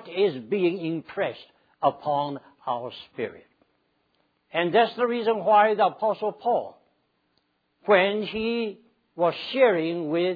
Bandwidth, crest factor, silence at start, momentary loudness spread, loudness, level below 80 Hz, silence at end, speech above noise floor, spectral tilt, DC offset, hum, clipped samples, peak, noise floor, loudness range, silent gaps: 5 kHz; 22 dB; 0 s; 14 LU; -25 LUFS; -68 dBFS; 0 s; 47 dB; -8 dB/octave; under 0.1%; none; under 0.1%; -4 dBFS; -71 dBFS; 7 LU; none